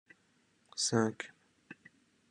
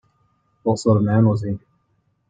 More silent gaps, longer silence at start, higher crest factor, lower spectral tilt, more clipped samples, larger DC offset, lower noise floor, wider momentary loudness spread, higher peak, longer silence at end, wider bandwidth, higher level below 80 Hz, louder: neither; about the same, 0.75 s vs 0.65 s; first, 24 dB vs 18 dB; second, -3.5 dB/octave vs -8 dB/octave; neither; neither; first, -72 dBFS vs -66 dBFS; first, 24 LU vs 12 LU; second, -14 dBFS vs -4 dBFS; about the same, 0.6 s vs 0.7 s; first, 11.5 kHz vs 9.2 kHz; second, -78 dBFS vs -54 dBFS; second, -34 LUFS vs -19 LUFS